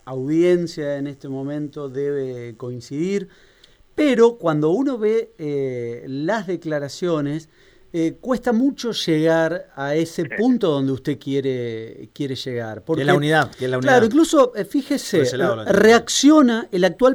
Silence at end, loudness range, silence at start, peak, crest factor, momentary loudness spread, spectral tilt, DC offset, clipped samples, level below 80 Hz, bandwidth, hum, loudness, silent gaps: 0 s; 8 LU; 0.05 s; -4 dBFS; 16 dB; 14 LU; -5 dB/octave; under 0.1%; under 0.1%; -56 dBFS; 16.5 kHz; none; -20 LUFS; none